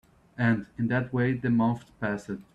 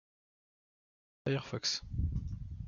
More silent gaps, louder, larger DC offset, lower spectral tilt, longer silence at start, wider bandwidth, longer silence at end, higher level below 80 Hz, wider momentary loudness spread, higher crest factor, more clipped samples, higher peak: neither; first, -28 LUFS vs -37 LUFS; neither; first, -8.5 dB/octave vs -4.5 dB/octave; second, 0.4 s vs 1.25 s; first, 8.6 kHz vs 7.4 kHz; first, 0.15 s vs 0 s; second, -60 dBFS vs -46 dBFS; about the same, 7 LU vs 7 LU; about the same, 16 dB vs 20 dB; neither; first, -10 dBFS vs -20 dBFS